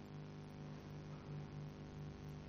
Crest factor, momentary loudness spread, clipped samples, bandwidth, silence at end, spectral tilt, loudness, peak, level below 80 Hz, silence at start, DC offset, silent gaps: 12 dB; 2 LU; under 0.1%; 14.5 kHz; 0 s; -7.5 dB/octave; -52 LUFS; -40 dBFS; -66 dBFS; 0 s; under 0.1%; none